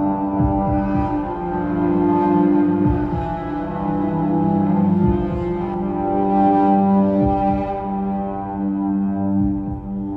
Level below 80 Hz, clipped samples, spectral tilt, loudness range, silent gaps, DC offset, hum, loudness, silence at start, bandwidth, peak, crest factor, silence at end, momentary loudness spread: -34 dBFS; under 0.1%; -11 dB/octave; 2 LU; none; under 0.1%; none; -19 LUFS; 0 s; 4.5 kHz; -4 dBFS; 14 dB; 0 s; 8 LU